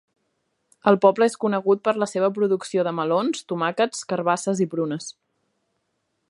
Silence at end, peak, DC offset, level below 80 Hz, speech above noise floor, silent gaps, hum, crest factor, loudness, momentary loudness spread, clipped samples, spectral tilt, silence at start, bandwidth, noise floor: 1.2 s; -2 dBFS; under 0.1%; -74 dBFS; 53 dB; none; none; 20 dB; -22 LUFS; 8 LU; under 0.1%; -5 dB/octave; 0.85 s; 11.5 kHz; -74 dBFS